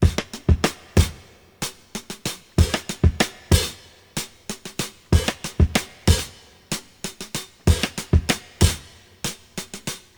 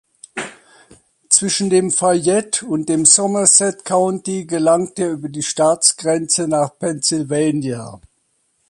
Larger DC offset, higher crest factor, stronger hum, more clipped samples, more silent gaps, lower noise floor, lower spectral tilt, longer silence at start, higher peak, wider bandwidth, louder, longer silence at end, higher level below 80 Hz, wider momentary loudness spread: neither; about the same, 22 dB vs 18 dB; neither; neither; neither; second, -47 dBFS vs -65 dBFS; first, -4.5 dB/octave vs -3 dB/octave; second, 0 s vs 0.35 s; about the same, 0 dBFS vs 0 dBFS; first, over 20 kHz vs 11.5 kHz; second, -23 LUFS vs -15 LUFS; second, 0.2 s vs 0.75 s; first, -28 dBFS vs -60 dBFS; about the same, 13 LU vs 14 LU